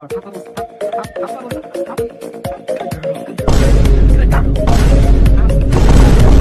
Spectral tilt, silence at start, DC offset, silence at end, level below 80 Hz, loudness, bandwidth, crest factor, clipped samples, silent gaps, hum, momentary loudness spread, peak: -7 dB/octave; 0 s; under 0.1%; 0 s; -12 dBFS; -14 LUFS; 13 kHz; 10 dB; under 0.1%; none; none; 15 LU; 0 dBFS